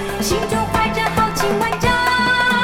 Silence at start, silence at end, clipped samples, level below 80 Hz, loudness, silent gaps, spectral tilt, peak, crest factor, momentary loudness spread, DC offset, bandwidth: 0 s; 0 s; under 0.1%; -34 dBFS; -17 LUFS; none; -4 dB/octave; -4 dBFS; 14 dB; 4 LU; under 0.1%; 18.5 kHz